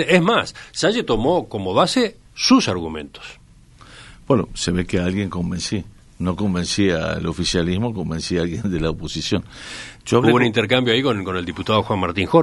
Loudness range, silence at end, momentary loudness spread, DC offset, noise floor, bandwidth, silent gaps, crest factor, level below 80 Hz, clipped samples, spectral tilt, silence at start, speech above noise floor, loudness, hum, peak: 4 LU; 0 s; 11 LU; under 0.1%; -46 dBFS; 11.5 kHz; none; 20 dB; -40 dBFS; under 0.1%; -5 dB/octave; 0 s; 27 dB; -20 LUFS; none; 0 dBFS